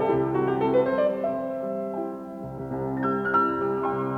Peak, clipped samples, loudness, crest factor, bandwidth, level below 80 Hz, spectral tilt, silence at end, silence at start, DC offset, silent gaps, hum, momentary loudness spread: -10 dBFS; under 0.1%; -26 LUFS; 14 dB; 5.2 kHz; -56 dBFS; -9 dB/octave; 0 s; 0 s; under 0.1%; none; none; 11 LU